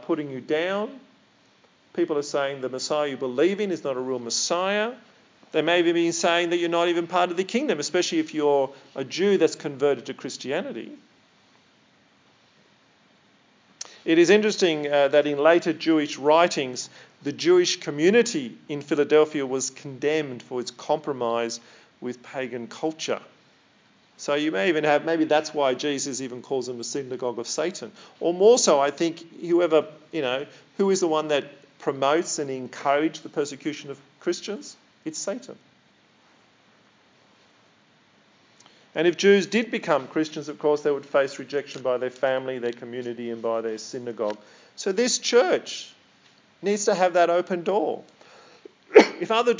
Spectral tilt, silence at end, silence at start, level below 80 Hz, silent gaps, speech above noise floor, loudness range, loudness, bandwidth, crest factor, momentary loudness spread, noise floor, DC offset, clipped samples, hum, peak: -3.5 dB/octave; 0 s; 0 s; -82 dBFS; none; 36 dB; 9 LU; -24 LUFS; 7.6 kHz; 24 dB; 14 LU; -60 dBFS; under 0.1%; under 0.1%; none; 0 dBFS